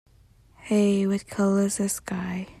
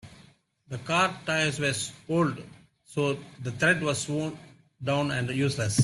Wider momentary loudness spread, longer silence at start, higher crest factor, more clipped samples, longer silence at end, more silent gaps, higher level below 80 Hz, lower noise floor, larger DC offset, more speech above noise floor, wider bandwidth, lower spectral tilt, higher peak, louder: second, 9 LU vs 12 LU; first, 0.6 s vs 0.05 s; about the same, 14 dB vs 18 dB; neither; about the same, 0.05 s vs 0 s; neither; about the same, -58 dBFS vs -62 dBFS; about the same, -57 dBFS vs -58 dBFS; neither; about the same, 32 dB vs 31 dB; about the same, 13.5 kHz vs 12.5 kHz; about the same, -5.5 dB/octave vs -4.5 dB/octave; about the same, -12 dBFS vs -10 dBFS; first, -25 LUFS vs -28 LUFS